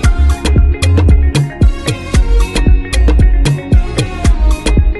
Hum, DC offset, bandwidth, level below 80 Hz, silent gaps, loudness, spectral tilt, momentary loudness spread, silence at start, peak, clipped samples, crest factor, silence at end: none; under 0.1%; 12 kHz; -10 dBFS; none; -12 LUFS; -6 dB/octave; 4 LU; 0 s; 0 dBFS; under 0.1%; 10 dB; 0 s